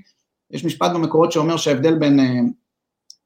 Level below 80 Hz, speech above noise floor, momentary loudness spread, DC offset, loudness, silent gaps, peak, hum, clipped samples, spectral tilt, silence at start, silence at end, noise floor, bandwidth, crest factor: -66 dBFS; 61 dB; 10 LU; under 0.1%; -18 LUFS; none; -2 dBFS; none; under 0.1%; -6 dB/octave; 0.5 s; 0.75 s; -78 dBFS; 15.5 kHz; 16 dB